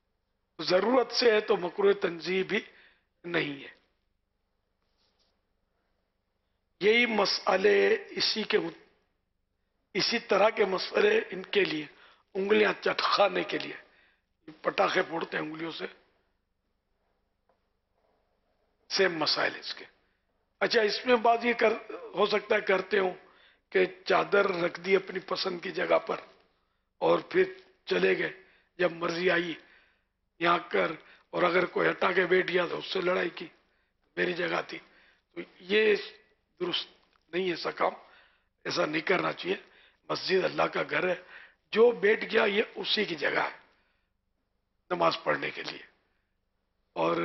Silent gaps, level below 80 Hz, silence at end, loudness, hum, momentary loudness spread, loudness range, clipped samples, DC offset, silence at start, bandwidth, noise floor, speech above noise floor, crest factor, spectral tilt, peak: none; -72 dBFS; 0 s; -28 LUFS; none; 13 LU; 7 LU; under 0.1%; under 0.1%; 0.6 s; 6.2 kHz; -78 dBFS; 50 dB; 18 dB; -4.5 dB/octave; -12 dBFS